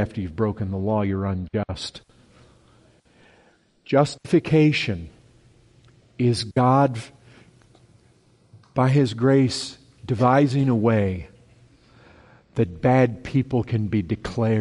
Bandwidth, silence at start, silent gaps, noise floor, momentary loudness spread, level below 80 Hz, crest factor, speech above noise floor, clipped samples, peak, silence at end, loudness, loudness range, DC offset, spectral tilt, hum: 11.5 kHz; 0 s; none; -59 dBFS; 13 LU; -50 dBFS; 18 dB; 38 dB; under 0.1%; -4 dBFS; 0 s; -22 LUFS; 7 LU; under 0.1%; -7 dB/octave; none